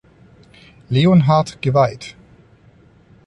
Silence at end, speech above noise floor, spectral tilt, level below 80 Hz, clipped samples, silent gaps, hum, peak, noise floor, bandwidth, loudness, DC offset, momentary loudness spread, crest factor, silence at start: 1.15 s; 35 dB; -7.5 dB/octave; -50 dBFS; under 0.1%; none; none; -2 dBFS; -49 dBFS; 11 kHz; -16 LUFS; under 0.1%; 17 LU; 16 dB; 0.9 s